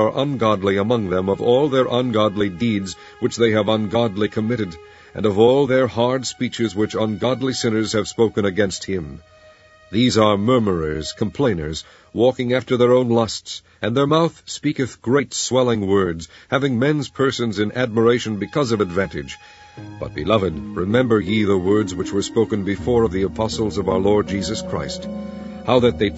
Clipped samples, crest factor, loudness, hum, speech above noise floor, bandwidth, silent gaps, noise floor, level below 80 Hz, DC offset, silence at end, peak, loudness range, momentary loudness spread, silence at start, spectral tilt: under 0.1%; 18 dB; -19 LUFS; none; 29 dB; 8 kHz; none; -48 dBFS; -46 dBFS; under 0.1%; 0 s; 0 dBFS; 2 LU; 10 LU; 0 s; -5.5 dB/octave